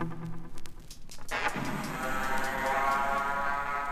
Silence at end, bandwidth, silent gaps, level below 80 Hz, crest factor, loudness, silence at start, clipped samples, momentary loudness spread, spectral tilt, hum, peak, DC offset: 0 s; 15 kHz; none; -44 dBFS; 14 dB; -31 LUFS; 0 s; under 0.1%; 20 LU; -4 dB/octave; none; -16 dBFS; under 0.1%